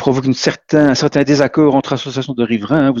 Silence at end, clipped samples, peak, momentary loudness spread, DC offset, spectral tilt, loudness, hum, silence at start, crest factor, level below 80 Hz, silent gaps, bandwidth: 0 s; under 0.1%; 0 dBFS; 8 LU; under 0.1%; -6 dB/octave; -14 LUFS; none; 0 s; 14 dB; -48 dBFS; none; 7.6 kHz